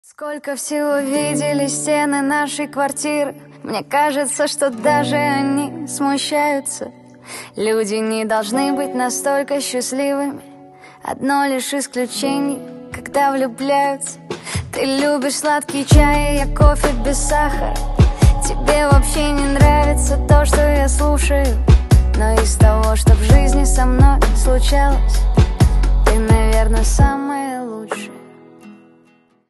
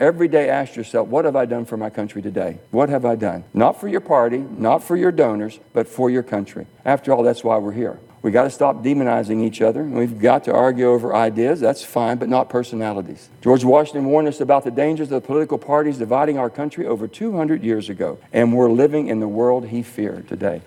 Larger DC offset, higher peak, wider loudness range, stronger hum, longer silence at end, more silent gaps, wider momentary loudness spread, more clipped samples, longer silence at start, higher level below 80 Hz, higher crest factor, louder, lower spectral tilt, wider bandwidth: neither; about the same, 0 dBFS vs -2 dBFS; first, 6 LU vs 3 LU; neither; first, 0.75 s vs 0.05 s; neither; about the same, 12 LU vs 10 LU; neither; first, 0.2 s vs 0 s; first, -18 dBFS vs -64 dBFS; about the same, 16 dB vs 18 dB; about the same, -17 LUFS vs -19 LUFS; second, -5 dB/octave vs -7 dB/octave; second, 12.5 kHz vs 17.5 kHz